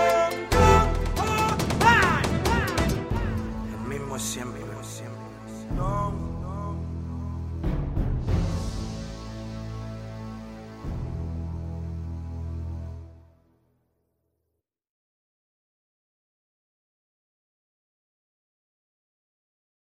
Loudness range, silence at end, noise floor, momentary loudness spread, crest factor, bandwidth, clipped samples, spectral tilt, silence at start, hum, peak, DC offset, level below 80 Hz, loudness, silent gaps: 15 LU; 6.7 s; -81 dBFS; 17 LU; 24 dB; 16 kHz; under 0.1%; -5.5 dB/octave; 0 s; none; -4 dBFS; under 0.1%; -36 dBFS; -27 LUFS; none